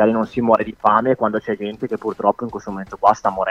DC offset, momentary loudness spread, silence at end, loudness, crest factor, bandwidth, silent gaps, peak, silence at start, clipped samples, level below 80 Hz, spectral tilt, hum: under 0.1%; 10 LU; 0 s; -19 LUFS; 18 dB; 7.8 kHz; none; 0 dBFS; 0 s; under 0.1%; -52 dBFS; -7 dB/octave; none